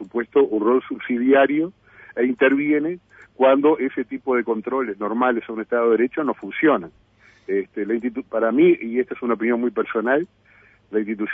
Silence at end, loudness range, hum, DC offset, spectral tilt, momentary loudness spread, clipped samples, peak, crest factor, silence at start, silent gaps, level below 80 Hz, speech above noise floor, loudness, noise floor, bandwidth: 0 s; 3 LU; none; under 0.1%; -8.5 dB/octave; 10 LU; under 0.1%; -4 dBFS; 16 dB; 0 s; none; -64 dBFS; 34 dB; -21 LUFS; -54 dBFS; 3.7 kHz